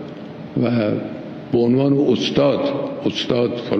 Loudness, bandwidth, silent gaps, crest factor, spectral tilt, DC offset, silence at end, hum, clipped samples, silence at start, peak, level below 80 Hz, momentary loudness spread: -19 LUFS; 7 kHz; none; 16 dB; -7 dB/octave; under 0.1%; 0 s; none; under 0.1%; 0 s; -2 dBFS; -54 dBFS; 13 LU